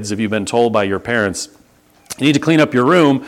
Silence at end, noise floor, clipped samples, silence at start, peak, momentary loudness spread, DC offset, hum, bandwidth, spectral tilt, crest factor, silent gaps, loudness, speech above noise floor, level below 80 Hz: 0 s; -51 dBFS; under 0.1%; 0 s; 0 dBFS; 11 LU; under 0.1%; none; 15.5 kHz; -5 dB/octave; 16 dB; none; -15 LUFS; 36 dB; -54 dBFS